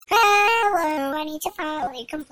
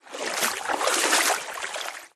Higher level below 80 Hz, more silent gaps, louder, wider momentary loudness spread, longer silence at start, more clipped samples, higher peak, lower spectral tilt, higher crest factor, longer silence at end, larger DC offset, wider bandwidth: first, -58 dBFS vs -72 dBFS; neither; first, -21 LUFS vs -24 LUFS; about the same, 13 LU vs 11 LU; about the same, 0.1 s vs 0.05 s; neither; about the same, -6 dBFS vs -8 dBFS; first, -1.5 dB/octave vs 1 dB/octave; about the same, 16 dB vs 20 dB; about the same, 0.1 s vs 0.1 s; neither; first, over 20 kHz vs 13.5 kHz